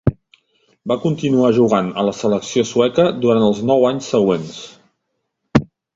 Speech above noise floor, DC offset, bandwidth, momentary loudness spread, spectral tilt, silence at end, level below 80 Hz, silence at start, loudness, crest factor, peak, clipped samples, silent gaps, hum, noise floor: 57 dB; under 0.1%; 8 kHz; 8 LU; -6.5 dB/octave; 0.3 s; -44 dBFS; 0.05 s; -17 LUFS; 16 dB; 0 dBFS; under 0.1%; none; none; -73 dBFS